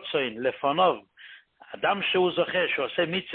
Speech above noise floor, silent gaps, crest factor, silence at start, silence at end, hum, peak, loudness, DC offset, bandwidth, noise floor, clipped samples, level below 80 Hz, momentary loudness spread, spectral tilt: 24 dB; none; 18 dB; 0 s; 0 s; none; -10 dBFS; -26 LUFS; under 0.1%; 4.4 kHz; -50 dBFS; under 0.1%; -68 dBFS; 6 LU; -9 dB/octave